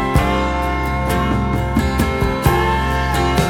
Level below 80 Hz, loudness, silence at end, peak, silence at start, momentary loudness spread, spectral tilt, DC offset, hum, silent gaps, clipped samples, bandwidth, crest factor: -22 dBFS; -18 LUFS; 0 s; -2 dBFS; 0 s; 3 LU; -6 dB/octave; under 0.1%; none; none; under 0.1%; 17.5 kHz; 16 dB